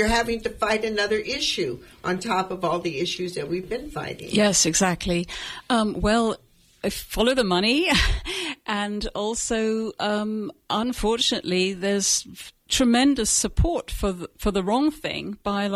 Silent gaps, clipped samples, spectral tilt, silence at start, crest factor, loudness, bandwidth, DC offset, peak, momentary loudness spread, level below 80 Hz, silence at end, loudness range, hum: none; under 0.1%; -3 dB/octave; 0 s; 18 dB; -23 LUFS; 16 kHz; under 0.1%; -6 dBFS; 10 LU; -36 dBFS; 0 s; 3 LU; none